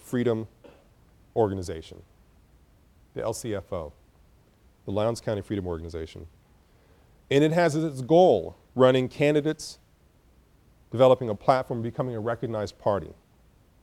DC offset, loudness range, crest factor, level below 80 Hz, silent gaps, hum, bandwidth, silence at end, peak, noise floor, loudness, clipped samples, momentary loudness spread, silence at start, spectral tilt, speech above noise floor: under 0.1%; 11 LU; 22 dB; -54 dBFS; none; none; 14 kHz; 0.7 s; -6 dBFS; -60 dBFS; -26 LUFS; under 0.1%; 19 LU; 0.05 s; -6.5 dB/octave; 35 dB